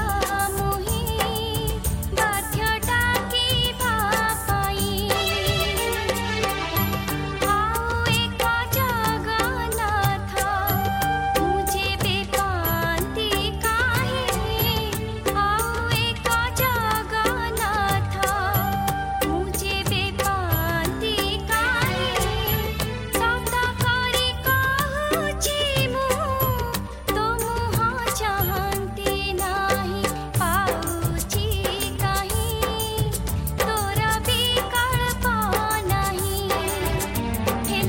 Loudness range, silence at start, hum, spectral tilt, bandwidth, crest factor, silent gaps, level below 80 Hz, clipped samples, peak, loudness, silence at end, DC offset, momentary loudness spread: 2 LU; 0 s; none; -3.5 dB/octave; 17 kHz; 16 dB; none; -34 dBFS; under 0.1%; -6 dBFS; -23 LUFS; 0 s; under 0.1%; 4 LU